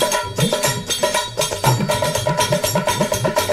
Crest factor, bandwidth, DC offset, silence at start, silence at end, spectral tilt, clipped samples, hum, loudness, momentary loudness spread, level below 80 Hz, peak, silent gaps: 16 dB; 16 kHz; under 0.1%; 0 s; 0 s; -3.5 dB/octave; under 0.1%; none; -18 LUFS; 2 LU; -42 dBFS; -4 dBFS; none